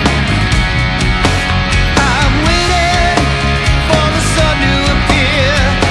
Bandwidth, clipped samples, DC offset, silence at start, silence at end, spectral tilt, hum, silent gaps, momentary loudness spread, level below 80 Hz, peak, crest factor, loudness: 12 kHz; under 0.1%; under 0.1%; 0 s; 0 s; -4.5 dB/octave; none; none; 2 LU; -18 dBFS; 0 dBFS; 10 dB; -11 LUFS